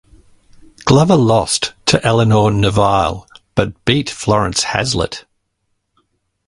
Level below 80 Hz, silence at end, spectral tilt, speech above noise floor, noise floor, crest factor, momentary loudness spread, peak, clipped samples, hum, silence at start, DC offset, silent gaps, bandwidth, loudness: -38 dBFS; 1.3 s; -5 dB/octave; 55 dB; -69 dBFS; 16 dB; 10 LU; 0 dBFS; under 0.1%; none; 0.85 s; under 0.1%; none; 11.5 kHz; -14 LUFS